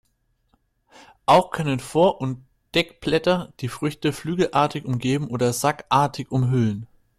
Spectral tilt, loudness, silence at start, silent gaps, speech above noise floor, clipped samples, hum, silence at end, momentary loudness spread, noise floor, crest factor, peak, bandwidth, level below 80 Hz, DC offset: -5.5 dB/octave; -22 LUFS; 1.3 s; none; 47 dB; under 0.1%; none; 0.35 s; 10 LU; -68 dBFS; 18 dB; -4 dBFS; 14.5 kHz; -54 dBFS; under 0.1%